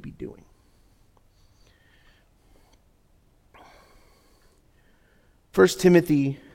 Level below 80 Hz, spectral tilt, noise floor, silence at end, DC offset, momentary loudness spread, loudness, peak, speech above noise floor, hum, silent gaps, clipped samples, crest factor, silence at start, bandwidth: -56 dBFS; -6 dB/octave; -61 dBFS; 0.2 s; under 0.1%; 23 LU; -20 LUFS; -4 dBFS; 40 dB; none; none; under 0.1%; 24 dB; 0.05 s; 16.5 kHz